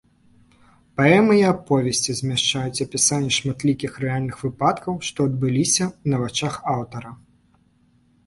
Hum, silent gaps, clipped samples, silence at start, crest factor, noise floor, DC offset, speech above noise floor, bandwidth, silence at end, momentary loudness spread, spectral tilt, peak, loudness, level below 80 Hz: none; none; under 0.1%; 1 s; 20 dB; -60 dBFS; under 0.1%; 39 dB; 11.5 kHz; 1.1 s; 10 LU; -4 dB/octave; -2 dBFS; -21 LUFS; -54 dBFS